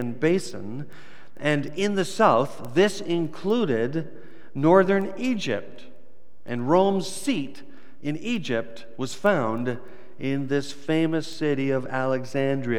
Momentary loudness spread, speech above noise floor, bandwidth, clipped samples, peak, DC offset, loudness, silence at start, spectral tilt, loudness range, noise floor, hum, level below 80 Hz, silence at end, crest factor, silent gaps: 14 LU; 34 dB; 16 kHz; under 0.1%; -4 dBFS; 2%; -25 LUFS; 0 s; -6 dB/octave; 4 LU; -58 dBFS; none; -68 dBFS; 0 s; 22 dB; none